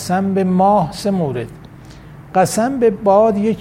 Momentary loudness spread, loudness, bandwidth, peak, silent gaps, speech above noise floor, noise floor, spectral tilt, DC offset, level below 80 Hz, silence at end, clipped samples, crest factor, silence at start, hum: 8 LU; -15 LUFS; 16 kHz; -2 dBFS; none; 22 dB; -37 dBFS; -6.5 dB/octave; under 0.1%; -46 dBFS; 0 s; under 0.1%; 14 dB; 0 s; none